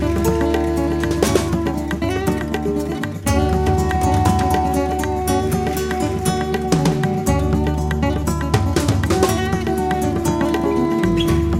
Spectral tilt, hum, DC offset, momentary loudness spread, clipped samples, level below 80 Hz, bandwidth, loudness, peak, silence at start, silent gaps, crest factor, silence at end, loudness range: -6 dB/octave; none; under 0.1%; 4 LU; under 0.1%; -28 dBFS; 16 kHz; -19 LUFS; 0 dBFS; 0 s; none; 16 dB; 0 s; 1 LU